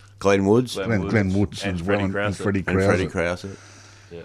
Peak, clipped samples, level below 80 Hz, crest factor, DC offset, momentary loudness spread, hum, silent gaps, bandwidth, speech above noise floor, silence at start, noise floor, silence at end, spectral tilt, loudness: -4 dBFS; under 0.1%; -48 dBFS; 18 dB; under 0.1%; 9 LU; none; none; 13 kHz; 20 dB; 0.2 s; -41 dBFS; 0 s; -6.5 dB/octave; -22 LUFS